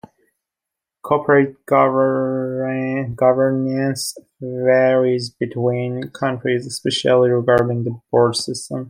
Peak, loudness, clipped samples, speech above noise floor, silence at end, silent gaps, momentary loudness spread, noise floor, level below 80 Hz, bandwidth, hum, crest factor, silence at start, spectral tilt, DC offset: -2 dBFS; -18 LUFS; under 0.1%; 67 dB; 0 s; none; 10 LU; -85 dBFS; -58 dBFS; 16 kHz; none; 16 dB; 1.05 s; -5.5 dB/octave; under 0.1%